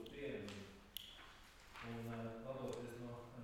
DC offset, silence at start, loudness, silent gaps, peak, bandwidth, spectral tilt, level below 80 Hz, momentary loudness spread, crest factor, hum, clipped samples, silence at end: under 0.1%; 0 s; -51 LUFS; none; -28 dBFS; 17.5 kHz; -5.5 dB/octave; -68 dBFS; 11 LU; 24 dB; none; under 0.1%; 0 s